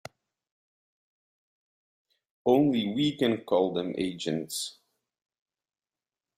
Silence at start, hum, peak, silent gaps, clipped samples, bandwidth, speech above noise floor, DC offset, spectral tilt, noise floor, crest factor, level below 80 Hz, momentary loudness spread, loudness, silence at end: 2.45 s; none; -10 dBFS; none; under 0.1%; 16 kHz; over 63 dB; under 0.1%; -5 dB/octave; under -90 dBFS; 20 dB; -70 dBFS; 10 LU; -28 LUFS; 1.65 s